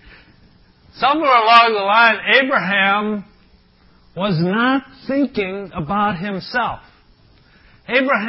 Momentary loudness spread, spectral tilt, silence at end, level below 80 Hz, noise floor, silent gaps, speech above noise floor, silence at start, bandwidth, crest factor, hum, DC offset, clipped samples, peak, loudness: 14 LU; -7 dB/octave; 0 s; -52 dBFS; -52 dBFS; none; 36 dB; 0.95 s; 8 kHz; 18 dB; none; under 0.1%; under 0.1%; 0 dBFS; -16 LUFS